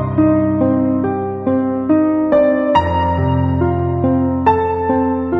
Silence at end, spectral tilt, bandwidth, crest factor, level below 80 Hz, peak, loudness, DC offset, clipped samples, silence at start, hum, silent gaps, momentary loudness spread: 0 s; -10 dB/octave; 5.6 kHz; 12 dB; -36 dBFS; -2 dBFS; -15 LUFS; under 0.1%; under 0.1%; 0 s; none; none; 4 LU